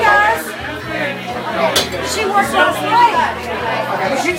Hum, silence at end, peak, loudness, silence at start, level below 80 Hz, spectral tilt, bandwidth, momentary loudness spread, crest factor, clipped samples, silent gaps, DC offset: none; 0 s; 0 dBFS; -15 LUFS; 0 s; -44 dBFS; -3 dB/octave; 16 kHz; 10 LU; 16 dB; under 0.1%; none; under 0.1%